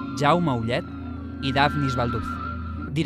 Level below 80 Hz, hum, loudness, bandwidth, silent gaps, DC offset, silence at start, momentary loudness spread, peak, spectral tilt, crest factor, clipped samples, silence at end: -44 dBFS; none; -25 LUFS; 13.5 kHz; none; under 0.1%; 0 s; 12 LU; -6 dBFS; -6.5 dB/octave; 20 dB; under 0.1%; 0 s